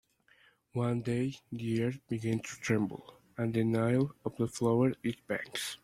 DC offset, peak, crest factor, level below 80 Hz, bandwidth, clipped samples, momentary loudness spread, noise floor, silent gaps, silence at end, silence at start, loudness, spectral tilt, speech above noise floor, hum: under 0.1%; -16 dBFS; 18 dB; -66 dBFS; 15 kHz; under 0.1%; 9 LU; -66 dBFS; none; 0.1 s; 0.75 s; -33 LUFS; -6.5 dB/octave; 34 dB; none